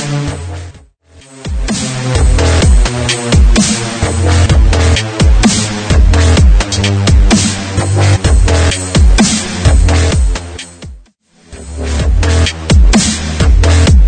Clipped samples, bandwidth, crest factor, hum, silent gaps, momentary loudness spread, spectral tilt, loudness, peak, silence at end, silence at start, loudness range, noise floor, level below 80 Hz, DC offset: under 0.1%; 9.4 kHz; 10 dB; none; none; 11 LU; -4.5 dB/octave; -11 LUFS; 0 dBFS; 0 s; 0 s; 4 LU; -45 dBFS; -12 dBFS; under 0.1%